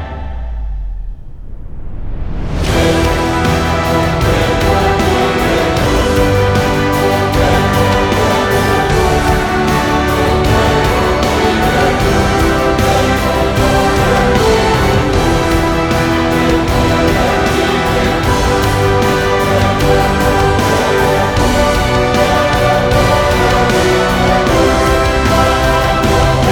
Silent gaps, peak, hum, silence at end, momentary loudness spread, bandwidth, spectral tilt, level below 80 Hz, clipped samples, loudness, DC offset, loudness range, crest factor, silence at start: none; 0 dBFS; none; 0 s; 2 LU; over 20 kHz; -5.5 dB/octave; -22 dBFS; under 0.1%; -12 LUFS; under 0.1%; 2 LU; 10 dB; 0 s